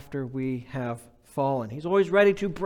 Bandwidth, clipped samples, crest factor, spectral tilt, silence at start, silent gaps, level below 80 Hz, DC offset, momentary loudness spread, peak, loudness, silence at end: 12.5 kHz; under 0.1%; 16 dB; -7 dB/octave; 0 s; none; -56 dBFS; under 0.1%; 14 LU; -10 dBFS; -26 LUFS; 0 s